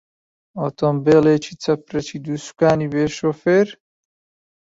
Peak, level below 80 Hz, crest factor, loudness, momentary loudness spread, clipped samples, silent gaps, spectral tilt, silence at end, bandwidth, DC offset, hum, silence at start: -2 dBFS; -54 dBFS; 18 dB; -19 LUFS; 13 LU; under 0.1%; none; -6.5 dB/octave; 0.95 s; 8 kHz; under 0.1%; none; 0.55 s